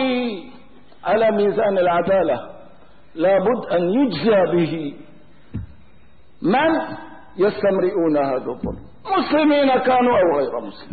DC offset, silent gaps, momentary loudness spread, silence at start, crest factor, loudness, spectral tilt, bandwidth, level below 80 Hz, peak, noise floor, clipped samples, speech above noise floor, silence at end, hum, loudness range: 0.8%; none; 18 LU; 0 s; 12 dB; -19 LUFS; -11 dB/octave; 4.8 kHz; -50 dBFS; -8 dBFS; -53 dBFS; under 0.1%; 35 dB; 0 s; none; 3 LU